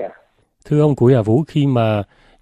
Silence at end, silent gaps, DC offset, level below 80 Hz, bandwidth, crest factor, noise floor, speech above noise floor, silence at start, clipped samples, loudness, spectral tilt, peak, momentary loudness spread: 0.4 s; none; under 0.1%; -50 dBFS; 8.8 kHz; 14 dB; -54 dBFS; 39 dB; 0 s; under 0.1%; -16 LUFS; -9 dB/octave; -2 dBFS; 12 LU